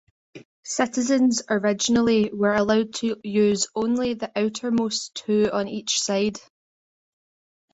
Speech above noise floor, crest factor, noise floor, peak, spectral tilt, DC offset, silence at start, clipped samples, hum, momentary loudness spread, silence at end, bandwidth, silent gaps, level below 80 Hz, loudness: over 68 dB; 16 dB; under -90 dBFS; -8 dBFS; -4 dB/octave; under 0.1%; 0.35 s; under 0.1%; none; 7 LU; 1.35 s; 8.4 kHz; 0.45-0.63 s; -60 dBFS; -23 LUFS